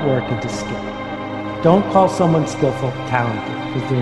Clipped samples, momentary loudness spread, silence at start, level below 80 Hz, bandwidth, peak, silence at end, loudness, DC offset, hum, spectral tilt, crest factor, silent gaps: under 0.1%; 12 LU; 0 s; -44 dBFS; 12 kHz; 0 dBFS; 0 s; -19 LUFS; under 0.1%; none; -6.5 dB/octave; 18 dB; none